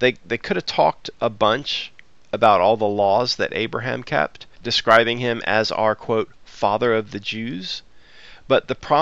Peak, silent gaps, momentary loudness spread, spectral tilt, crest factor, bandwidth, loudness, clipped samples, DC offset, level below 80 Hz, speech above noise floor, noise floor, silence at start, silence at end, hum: 0 dBFS; none; 12 LU; -4.5 dB/octave; 20 dB; 8 kHz; -20 LUFS; under 0.1%; 0.5%; -52 dBFS; 27 dB; -47 dBFS; 0 s; 0 s; none